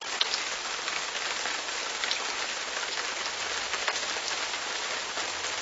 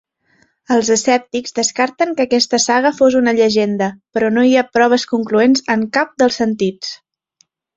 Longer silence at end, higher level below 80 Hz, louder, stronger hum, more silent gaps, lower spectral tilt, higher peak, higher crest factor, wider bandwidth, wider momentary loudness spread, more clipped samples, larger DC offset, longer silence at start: second, 0 s vs 0.8 s; second, -66 dBFS vs -58 dBFS; second, -30 LUFS vs -15 LUFS; neither; neither; second, 1 dB/octave vs -3.5 dB/octave; second, -8 dBFS vs 0 dBFS; first, 24 dB vs 14 dB; about the same, 8.2 kHz vs 8 kHz; second, 3 LU vs 7 LU; neither; neither; second, 0 s vs 0.7 s